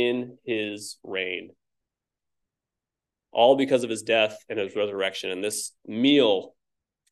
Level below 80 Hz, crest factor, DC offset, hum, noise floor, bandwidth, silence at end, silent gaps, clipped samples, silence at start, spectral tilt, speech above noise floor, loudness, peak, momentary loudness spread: -74 dBFS; 20 dB; under 0.1%; none; -88 dBFS; 12.5 kHz; 0.6 s; none; under 0.1%; 0 s; -3.5 dB/octave; 64 dB; -25 LUFS; -6 dBFS; 12 LU